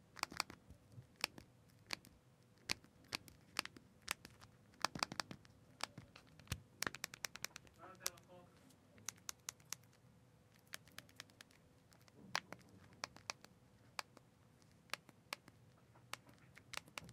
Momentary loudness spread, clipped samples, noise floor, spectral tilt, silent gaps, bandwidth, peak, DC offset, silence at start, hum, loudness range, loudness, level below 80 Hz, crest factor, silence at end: 23 LU; under 0.1%; -69 dBFS; -1.5 dB/octave; none; 16 kHz; -14 dBFS; under 0.1%; 0 s; none; 7 LU; -49 LUFS; -74 dBFS; 38 dB; 0 s